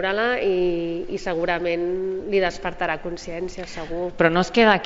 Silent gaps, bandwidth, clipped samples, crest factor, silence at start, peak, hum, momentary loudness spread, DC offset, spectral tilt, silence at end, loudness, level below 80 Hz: none; 7.8 kHz; under 0.1%; 20 dB; 0 s; -4 dBFS; none; 12 LU; under 0.1%; -3.5 dB/octave; 0 s; -23 LUFS; -42 dBFS